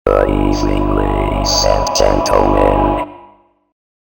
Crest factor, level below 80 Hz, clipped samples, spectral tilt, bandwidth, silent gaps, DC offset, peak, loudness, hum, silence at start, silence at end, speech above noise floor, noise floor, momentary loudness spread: 14 dB; -22 dBFS; under 0.1%; -4.5 dB/octave; 18.5 kHz; none; under 0.1%; 0 dBFS; -14 LUFS; 50 Hz at -25 dBFS; 0.05 s; 0.9 s; 34 dB; -46 dBFS; 4 LU